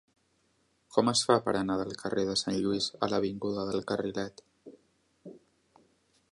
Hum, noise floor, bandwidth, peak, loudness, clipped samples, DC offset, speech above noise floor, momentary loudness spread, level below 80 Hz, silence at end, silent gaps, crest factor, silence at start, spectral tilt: none; -72 dBFS; 11.5 kHz; -10 dBFS; -30 LUFS; under 0.1%; under 0.1%; 42 dB; 8 LU; -64 dBFS; 0.95 s; none; 24 dB; 0.9 s; -4 dB/octave